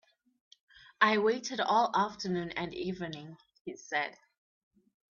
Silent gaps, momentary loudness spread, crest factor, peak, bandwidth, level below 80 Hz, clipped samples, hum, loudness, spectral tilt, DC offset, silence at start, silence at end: 3.61-3.65 s; 19 LU; 26 dB; -8 dBFS; 7.4 kHz; -70 dBFS; under 0.1%; none; -31 LUFS; -4.5 dB/octave; under 0.1%; 1 s; 1 s